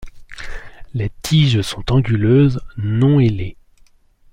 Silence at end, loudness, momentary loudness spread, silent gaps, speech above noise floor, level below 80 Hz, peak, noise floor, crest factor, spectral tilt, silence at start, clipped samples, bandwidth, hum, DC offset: 0.8 s; -16 LUFS; 20 LU; none; 35 dB; -36 dBFS; -4 dBFS; -50 dBFS; 14 dB; -7 dB/octave; 0 s; under 0.1%; 15.5 kHz; none; under 0.1%